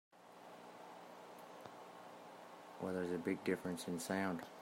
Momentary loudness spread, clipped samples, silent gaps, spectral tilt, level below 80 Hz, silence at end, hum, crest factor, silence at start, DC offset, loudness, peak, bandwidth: 16 LU; under 0.1%; none; -5 dB/octave; -86 dBFS; 0 s; 60 Hz at -70 dBFS; 20 dB; 0.15 s; under 0.1%; -43 LUFS; -24 dBFS; 16 kHz